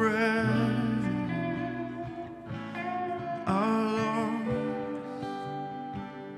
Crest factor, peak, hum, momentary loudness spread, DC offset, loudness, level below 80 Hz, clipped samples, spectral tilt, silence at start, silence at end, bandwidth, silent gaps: 16 dB; -14 dBFS; none; 12 LU; under 0.1%; -31 LUFS; -60 dBFS; under 0.1%; -7 dB/octave; 0 s; 0 s; 12 kHz; none